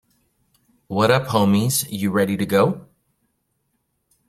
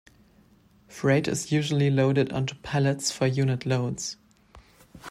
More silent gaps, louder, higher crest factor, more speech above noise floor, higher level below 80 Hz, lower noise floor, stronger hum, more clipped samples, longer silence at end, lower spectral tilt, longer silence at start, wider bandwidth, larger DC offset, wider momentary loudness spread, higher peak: neither; first, -19 LUFS vs -26 LUFS; first, 22 dB vs 16 dB; first, 53 dB vs 34 dB; about the same, -56 dBFS vs -58 dBFS; first, -71 dBFS vs -59 dBFS; neither; neither; first, 1.45 s vs 0 s; about the same, -5 dB/octave vs -5.5 dB/octave; about the same, 0.9 s vs 0.9 s; first, 15.5 kHz vs 13.5 kHz; neither; second, 5 LU vs 11 LU; first, 0 dBFS vs -10 dBFS